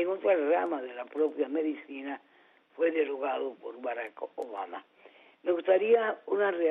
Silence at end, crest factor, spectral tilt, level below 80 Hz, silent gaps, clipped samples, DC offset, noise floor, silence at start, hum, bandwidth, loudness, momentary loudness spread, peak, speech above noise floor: 0 s; 18 dB; -2 dB/octave; -84 dBFS; none; under 0.1%; under 0.1%; -58 dBFS; 0 s; none; 3.9 kHz; -30 LUFS; 14 LU; -12 dBFS; 28 dB